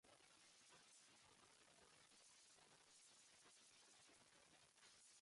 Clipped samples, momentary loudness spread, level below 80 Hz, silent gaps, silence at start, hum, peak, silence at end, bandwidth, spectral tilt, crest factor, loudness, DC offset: under 0.1%; 2 LU; under -90 dBFS; none; 0.05 s; none; -58 dBFS; 0 s; 11.5 kHz; -0.5 dB/octave; 12 dB; -69 LUFS; under 0.1%